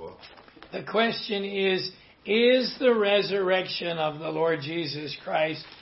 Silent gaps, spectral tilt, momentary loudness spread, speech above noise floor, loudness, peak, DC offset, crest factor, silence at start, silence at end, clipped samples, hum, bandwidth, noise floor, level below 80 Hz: none; -8 dB/octave; 12 LU; 24 dB; -26 LUFS; -10 dBFS; under 0.1%; 16 dB; 0 s; 0 s; under 0.1%; none; 6 kHz; -49 dBFS; -68 dBFS